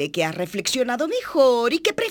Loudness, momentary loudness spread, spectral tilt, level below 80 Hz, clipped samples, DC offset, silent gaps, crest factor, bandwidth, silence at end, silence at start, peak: -21 LUFS; 7 LU; -3.5 dB/octave; -60 dBFS; under 0.1%; under 0.1%; none; 16 dB; 19.5 kHz; 0 s; 0 s; -6 dBFS